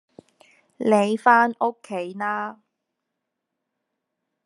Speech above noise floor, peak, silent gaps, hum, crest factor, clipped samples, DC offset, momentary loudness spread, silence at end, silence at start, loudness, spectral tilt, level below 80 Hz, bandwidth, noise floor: 60 dB; -2 dBFS; none; none; 22 dB; under 0.1%; under 0.1%; 14 LU; 1.95 s; 0.8 s; -21 LUFS; -5.5 dB/octave; -86 dBFS; 11 kHz; -81 dBFS